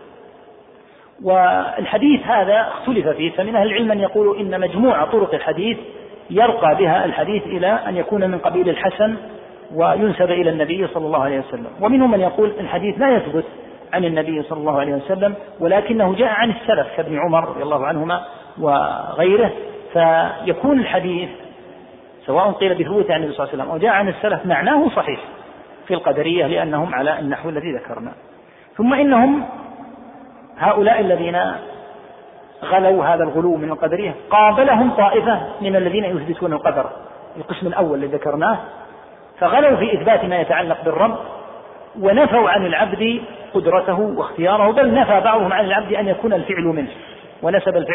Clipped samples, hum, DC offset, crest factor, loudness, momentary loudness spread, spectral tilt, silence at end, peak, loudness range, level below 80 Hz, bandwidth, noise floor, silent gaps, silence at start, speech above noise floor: under 0.1%; none; under 0.1%; 16 dB; -17 LUFS; 13 LU; -10 dB/octave; 0 s; -2 dBFS; 4 LU; -52 dBFS; 3.9 kHz; -46 dBFS; none; 0 s; 29 dB